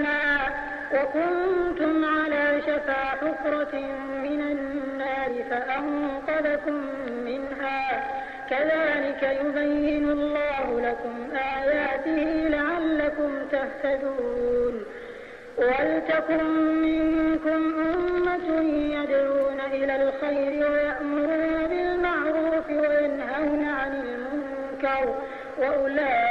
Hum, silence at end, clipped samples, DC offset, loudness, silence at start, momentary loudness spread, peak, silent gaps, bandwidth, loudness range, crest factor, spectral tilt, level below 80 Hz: none; 0 s; under 0.1%; under 0.1%; -25 LUFS; 0 s; 8 LU; -12 dBFS; none; 6.4 kHz; 4 LU; 14 dB; -6.5 dB/octave; -50 dBFS